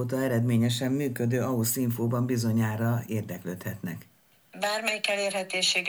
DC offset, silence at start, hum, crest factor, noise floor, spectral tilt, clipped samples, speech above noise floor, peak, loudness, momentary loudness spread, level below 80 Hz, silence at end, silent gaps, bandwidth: under 0.1%; 0 s; none; 18 dB; -51 dBFS; -4.5 dB/octave; under 0.1%; 23 dB; -10 dBFS; -28 LUFS; 10 LU; -68 dBFS; 0 s; none; over 20 kHz